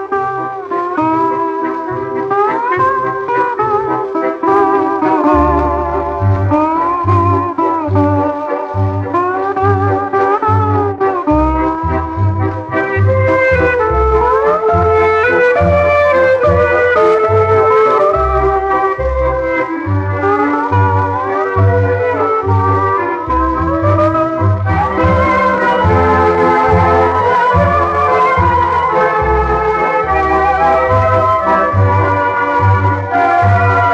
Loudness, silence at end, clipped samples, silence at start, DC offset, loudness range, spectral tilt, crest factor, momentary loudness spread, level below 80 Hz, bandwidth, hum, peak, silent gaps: -12 LUFS; 0 s; under 0.1%; 0 s; under 0.1%; 4 LU; -8.5 dB/octave; 12 dB; 6 LU; -28 dBFS; 7.4 kHz; none; 0 dBFS; none